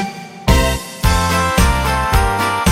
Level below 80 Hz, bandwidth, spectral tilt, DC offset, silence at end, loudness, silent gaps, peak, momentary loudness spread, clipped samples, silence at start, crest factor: -20 dBFS; 16.5 kHz; -4.5 dB/octave; under 0.1%; 0 s; -16 LUFS; none; -2 dBFS; 5 LU; under 0.1%; 0 s; 14 dB